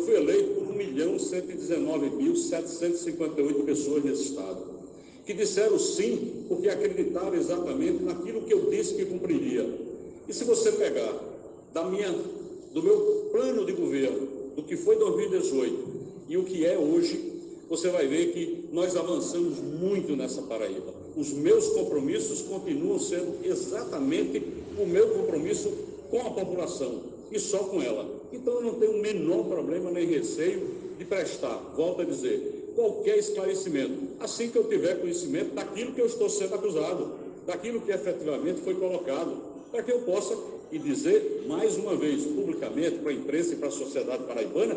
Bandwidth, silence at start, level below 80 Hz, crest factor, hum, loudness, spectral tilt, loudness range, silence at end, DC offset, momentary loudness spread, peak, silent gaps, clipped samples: 9.8 kHz; 0 s; -64 dBFS; 16 dB; none; -29 LUFS; -4.5 dB/octave; 3 LU; 0 s; under 0.1%; 10 LU; -12 dBFS; none; under 0.1%